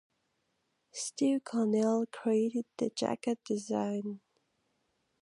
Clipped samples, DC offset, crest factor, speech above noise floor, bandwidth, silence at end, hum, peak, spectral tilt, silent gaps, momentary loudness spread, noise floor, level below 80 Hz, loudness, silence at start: under 0.1%; under 0.1%; 18 dB; 47 dB; 11.5 kHz; 1.05 s; none; -16 dBFS; -5 dB/octave; none; 10 LU; -79 dBFS; -82 dBFS; -33 LUFS; 0.95 s